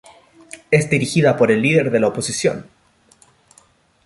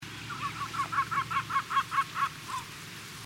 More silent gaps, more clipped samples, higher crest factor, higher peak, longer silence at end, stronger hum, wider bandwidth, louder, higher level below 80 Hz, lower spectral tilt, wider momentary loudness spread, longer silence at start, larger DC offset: neither; neither; about the same, 18 dB vs 18 dB; first, -2 dBFS vs -16 dBFS; first, 1.45 s vs 0 s; neither; second, 11.5 kHz vs 16 kHz; first, -17 LUFS vs -32 LUFS; first, -56 dBFS vs -62 dBFS; first, -5.5 dB/octave vs -2.5 dB/octave; first, 15 LU vs 11 LU; first, 0.55 s vs 0 s; neither